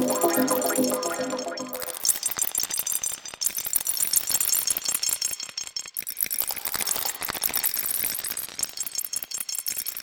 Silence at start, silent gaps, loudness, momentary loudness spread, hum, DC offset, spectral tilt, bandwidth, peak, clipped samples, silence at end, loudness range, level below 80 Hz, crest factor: 0 s; none; -25 LUFS; 9 LU; none; under 0.1%; -0.5 dB/octave; 19 kHz; -6 dBFS; under 0.1%; 0 s; 2 LU; -62 dBFS; 22 dB